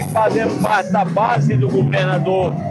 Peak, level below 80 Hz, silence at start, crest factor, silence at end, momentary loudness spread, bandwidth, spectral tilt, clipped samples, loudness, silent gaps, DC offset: -6 dBFS; -54 dBFS; 0 s; 12 dB; 0 s; 2 LU; 12.5 kHz; -7 dB/octave; under 0.1%; -17 LUFS; none; under 0.1%